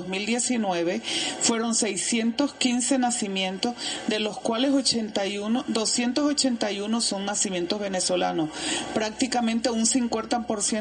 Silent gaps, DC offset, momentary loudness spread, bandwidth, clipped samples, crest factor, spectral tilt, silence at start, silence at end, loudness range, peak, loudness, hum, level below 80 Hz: none; under 0.1%; 5 LU; 10.5 kHz; under 0.1%; 18 dB; -2.5 dB/octave; 0 s; 0 s; 1 LU; -8 dBFS; -25 LUFS; none; -60 dBFS